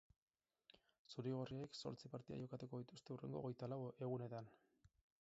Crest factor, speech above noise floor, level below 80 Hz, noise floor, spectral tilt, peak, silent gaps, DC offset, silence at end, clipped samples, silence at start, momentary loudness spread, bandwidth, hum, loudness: 18 dB; 25 dB; -82 dBFS; -75 dBFS; -7 dB/octave; -34 dBFS; 0.99-1.05 s; under 0.1%; 0.35 s; under 0.1%; 0.75 s; 7 LU; 7.6 kHz; none; -51 LUFS